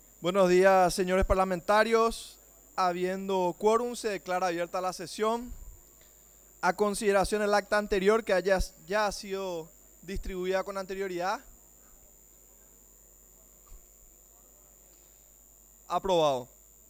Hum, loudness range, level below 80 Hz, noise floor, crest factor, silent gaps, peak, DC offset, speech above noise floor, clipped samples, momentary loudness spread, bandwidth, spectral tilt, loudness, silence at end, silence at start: 60 Hz at -65 dBFS; 10 LU; -46 dBFS; -57 dBFS; 20 dB; none; -10 dBFS; under 0.1%; 29 dB; under 0.1%; 14 LU; over 20 kHz; -4.5 dB/octave; -28 LUFS; 0.45 s; 0.2 s